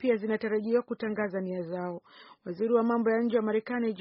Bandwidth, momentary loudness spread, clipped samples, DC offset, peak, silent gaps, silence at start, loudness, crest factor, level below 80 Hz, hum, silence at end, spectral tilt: 5.6 kHz; 11 LU; under 0.1%; under 0.1%; -14 dBFS; none; 0 s; -29 LUFS; 16 dB; -74 dBFS; none; 0 s; -6 dB/octave